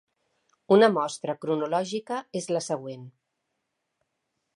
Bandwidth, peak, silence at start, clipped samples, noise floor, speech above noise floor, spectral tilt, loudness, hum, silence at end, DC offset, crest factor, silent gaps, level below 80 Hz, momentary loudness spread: 11.5 kHz; -8 dBFS; 0.7 s; under 0.1%; -80 dBFS; 55 dB; -5 dB/octave; -26 LUFS; none; 1.45 s; under 0.1%; 20 dB; none; -80 dBFS; 13 LU